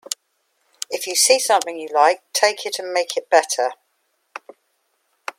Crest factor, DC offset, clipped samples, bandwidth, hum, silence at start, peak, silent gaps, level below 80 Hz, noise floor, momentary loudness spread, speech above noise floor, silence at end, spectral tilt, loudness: 20 dB; under 0.1%; under 0.1%; 16.5 kHz; none; 0.1 s; 0 dBFS; none; -82 dBFS; -69 dBFS; 21 LU; 50 dB; 1.65 s; 1.5 dB/octave; -19 LUFS